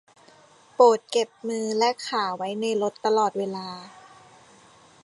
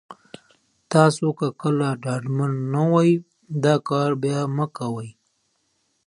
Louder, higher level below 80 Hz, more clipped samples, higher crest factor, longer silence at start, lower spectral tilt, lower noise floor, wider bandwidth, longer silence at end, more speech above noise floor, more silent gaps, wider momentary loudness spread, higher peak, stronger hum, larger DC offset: about the same, -24 LUFS vs -22 LUFS; second, -78 dBFS vs -68 dBFS; neither; about the same, 22 dB vs 22 dB; first, 0.8 s vs 0.1 s; second, -3.5 dB/octave vs -7 dB/octave; second, -54 dBFS vs -70 dBFS; about the same, 11.5 kHz vs 11 kHz; first, 1.15 s vs 0.95 s; second, 31 dB vs 49 dB; neither; first, 15 LU vs 11 LU; about the same, -4 dBFS vs -2 dBFS; neither; neither